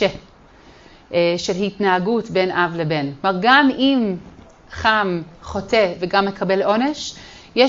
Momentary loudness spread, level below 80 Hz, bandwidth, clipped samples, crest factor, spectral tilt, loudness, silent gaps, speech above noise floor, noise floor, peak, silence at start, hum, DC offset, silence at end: 15 LU; -48 dBFS; 7.8 kHz; under 0.1%; 18 dB; -5 dB/octave; -19 LUFS; none; 28 dB; -47 dBFS; 0 dBFS; 0 s; none; under 0.1%; 0 s